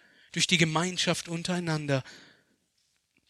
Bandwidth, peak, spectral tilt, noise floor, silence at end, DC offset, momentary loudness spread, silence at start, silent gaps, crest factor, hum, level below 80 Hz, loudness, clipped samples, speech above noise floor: 13 kHz; -8 dBFS; -3.5 dB/octave; -74 dBFS; 1.1 s; under 0.1%; 9 LU; 0.35 s; none; 22 dB; none; -68 dBFS; -28 LUFS; under 0.1%; 45 dB